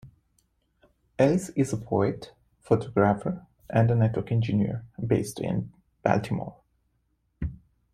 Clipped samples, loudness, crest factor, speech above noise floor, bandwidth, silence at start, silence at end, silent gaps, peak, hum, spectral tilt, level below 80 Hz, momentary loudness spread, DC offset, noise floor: under 0.1%; -27 LUFS; 20 dB; 47 dB; 14 kHz; 0.05 s; 0.4 s; none; -6 dBFS; none; -7.5 dB/octave; -52 dBFS; 14 LU; under 0.1%; -72 dBFS